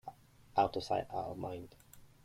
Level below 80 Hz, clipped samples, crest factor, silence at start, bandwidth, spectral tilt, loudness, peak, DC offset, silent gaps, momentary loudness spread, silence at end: -64 dBFS; under 0.1%; 22 dB; 0.05 s; 16 kHz; -6 dB/octave; -37 LUFS; -18 dBFS; under 0.1%; none; 18 LU; 0.2 s